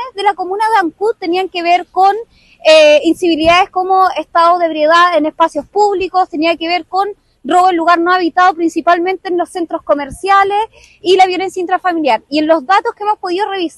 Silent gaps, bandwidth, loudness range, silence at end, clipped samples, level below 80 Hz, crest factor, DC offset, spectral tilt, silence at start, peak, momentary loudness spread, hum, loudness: none; 12.5 kHz; 3 LU; 0.1 s; under 0.1%; -48 dBFS; 12 dB; under 0.1%; -3 dB/octave; 0 s; 0 dBFS; 8 LU; none; -12 LUFS